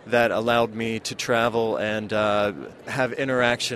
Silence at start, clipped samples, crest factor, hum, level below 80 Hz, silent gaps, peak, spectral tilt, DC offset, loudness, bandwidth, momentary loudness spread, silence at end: 0.05 s; under 0.1%; 20 dB; none; -56 dBFS; none; -4 dBFS; -4 dB/octave; under 0.1%; -23 LUFS; 14.5 kHz; 7 LU; 0 s